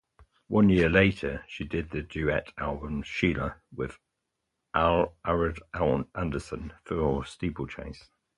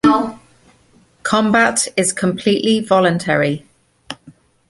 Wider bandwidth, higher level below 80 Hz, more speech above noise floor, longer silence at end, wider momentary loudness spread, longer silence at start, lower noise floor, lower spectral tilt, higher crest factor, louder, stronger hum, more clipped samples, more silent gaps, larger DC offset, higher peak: about the same, 11 kHz vs 11.5 kHz; first, -44 dBFS vs -52 dBFS; first, 54 dB vs 37 dB; about the same, 0.35 s vs 0.4 s; second, 15 LU vs 18 LU; first, 0.5 s vs 0.05 s; first, -82 dBFS vs -53 dBFS; first, -7.5 dB/octave vs -4 dB/octave; first, 22 dB vs 16 dB; second, -28 LUFS vs -16 LUFS; neither; neither; neither; neither; second, -6 dBFS vs -2 dBFS